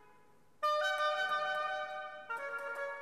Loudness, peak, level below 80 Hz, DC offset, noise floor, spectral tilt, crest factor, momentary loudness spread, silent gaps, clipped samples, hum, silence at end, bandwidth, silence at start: -36 LUFS; -24 dBFS; -82 dBFS; under 0.1%; -67 dBFS; -0.5 dB/octave; 14 dB; 10 LU; none; under 0.1%; none; 0 s; 14 kHz; 0.6 s